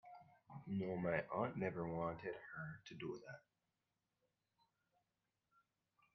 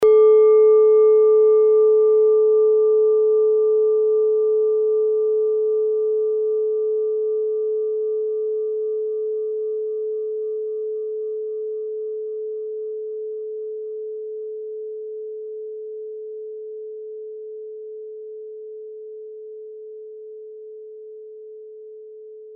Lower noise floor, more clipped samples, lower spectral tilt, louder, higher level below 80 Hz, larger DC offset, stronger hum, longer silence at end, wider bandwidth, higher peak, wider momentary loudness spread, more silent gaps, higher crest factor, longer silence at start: first, under -90 dBFS vs -40 dBFS; neither; first, -6 dB/octave vs -0.5 dB/octave; second, -45 LUFS vs -19 LUFS; second, -78 dBFS vs -72 dBFS; neither; neither; first, 2.75 s vs 0 s; first, 6 kHz vs 2.3 kHz; second, -24 dBFS vs -8 dBFS; second, 18 LU vs 24 LU; neither; first, 24 dB vs 12 dB; about the same, 0.05 s vs 0 s